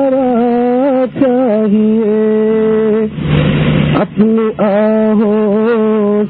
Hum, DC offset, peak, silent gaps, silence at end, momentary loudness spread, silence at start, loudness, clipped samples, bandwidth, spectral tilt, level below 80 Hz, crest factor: none; under 0.1%; 0 dBFS; none; 0 s; 2 LU; 0 s; -11 LUFS; under 0.1%; 4.2 kHz; -12.5 dB/octave; -36 dBFS; 10 dB